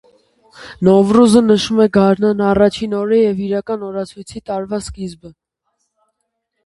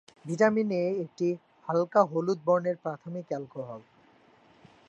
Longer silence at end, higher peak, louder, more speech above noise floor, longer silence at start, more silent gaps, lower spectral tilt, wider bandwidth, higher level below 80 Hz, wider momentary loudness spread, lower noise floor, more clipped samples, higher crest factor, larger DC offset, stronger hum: first, 1.35 s vs 1.1 s; first, 0 dBFS vs -8 dBFS; first, -14 LUFS vs -29 LUFS; first, 58 dB vs 32 dB; first, 0.6 s vs 0.25 s; neither; about the same, -6.5 dB/octave vs -7.5 dB/octave; first, 11.5 kHz vs 8.8 kHz; first, -44 dBFS vs -78 dBFS; first, 17 LU vs 14 LU; first, -72 dBFS vs -60 dBFS; neither; about the same, 16 dB vs 20 dB; neither; neither